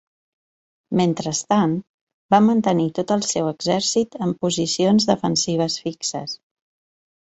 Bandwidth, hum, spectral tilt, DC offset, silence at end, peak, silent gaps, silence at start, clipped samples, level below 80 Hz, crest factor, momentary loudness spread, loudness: 8.2 kHz; none; -4.5 dB/octave; under 0.1%; 1 s; -2 dBFS; 1.89-2.07 s, 2.14-2.29 s; 0.9 s; under 0.1%; -60 dBFS; 20 dB; 9 LU; -20 LUFS